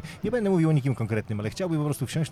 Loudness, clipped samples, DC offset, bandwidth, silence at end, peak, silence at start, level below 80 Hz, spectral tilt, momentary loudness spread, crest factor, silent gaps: -26 LUFS; under 0.1%; under 0.1%; 14 kHz; 0 s; -12 dBFS; 0 s; -54 dBFS; -7 dB/octave; 7 LU; 14 dB; none